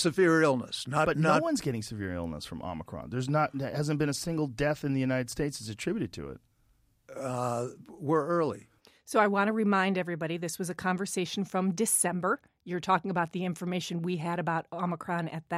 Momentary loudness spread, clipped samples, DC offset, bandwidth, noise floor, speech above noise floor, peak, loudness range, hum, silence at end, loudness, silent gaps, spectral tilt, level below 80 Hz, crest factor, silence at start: 12 LU; under 0.1%; under 0.1%; 15.5 kHz; -68 dBFS; 38 dB; -10 dBFS; 5 LU; none; 0 s; -30 LUFS; none; -5 dB/octave; -58 dBFS; 20 dB; 0 s